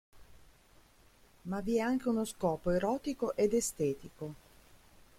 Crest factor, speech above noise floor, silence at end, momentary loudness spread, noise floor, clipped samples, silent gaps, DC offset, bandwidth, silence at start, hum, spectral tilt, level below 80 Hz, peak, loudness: 16 dB; 30 dB; 0.8 s; 15 LU; -63 dBFS; under 0.1%; none; under 0.1%; 16.5 kHz; 0.15 s; none; -5.5 dB/octave; -58 dBFS; -18 dBFS; -33 LUFS